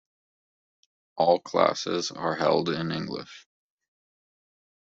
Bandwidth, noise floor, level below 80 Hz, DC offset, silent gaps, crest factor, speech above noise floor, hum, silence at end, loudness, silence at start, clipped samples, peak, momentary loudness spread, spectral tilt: 7.8 kHz; under -90 dBFS; -68 dBFS; under 0.1%; none; 24 dB; over 64 dB; none; 1.4 s; -26 LUFS; 1.15 s; under 0.1%; -6 dBFS; 14 LU; -4.5 dB/octave